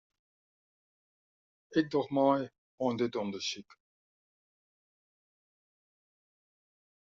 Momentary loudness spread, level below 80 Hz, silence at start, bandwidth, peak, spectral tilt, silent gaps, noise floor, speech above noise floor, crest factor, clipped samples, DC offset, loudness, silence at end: 9 LU; -78 dBFS; 1.7 s; 7.4 kHz; -12 dBFS; -4.5 dB/octave; 2.58-2.78 s; under -90 dBFS; over 59 dB; 24 dB; under 0.1%; under 0.1%; -32 LUFS; 3.5 s